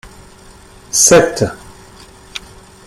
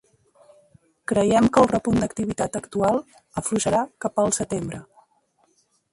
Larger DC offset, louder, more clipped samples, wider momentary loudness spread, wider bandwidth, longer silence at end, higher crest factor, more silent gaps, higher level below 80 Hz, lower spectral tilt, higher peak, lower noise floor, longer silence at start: neither; first, -11 LUFS vs -22 LUFS; neither; first, 22 LU vs 12 LU; first, 15.5 kHz vs 11.5 kHz; second, 0.5 s vs 1.1 s; about the same, 16 dB vs 20 dB; neither; first, -44 dBFS vs -50 dBFS; second, -2.5 dB/octave vs -5 dB/octave; first, 0 dBFS vs -4 dBFS; second, -40 dBFS vs -65 dBFS; second, 0.05 s vs 1.1 s